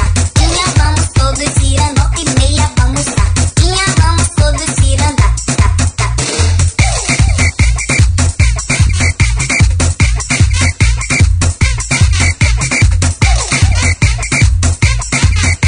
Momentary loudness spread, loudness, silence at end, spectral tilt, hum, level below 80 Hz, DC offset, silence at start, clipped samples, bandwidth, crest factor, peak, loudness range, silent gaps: 2 LU; -11 LUFS; 0 s; -4 dB/octave; none; -14 dBFS; under 0.1%; 0 s; 0.2%; 10.5 kHz; 10 dB; 0 dBFS; 1 LU; none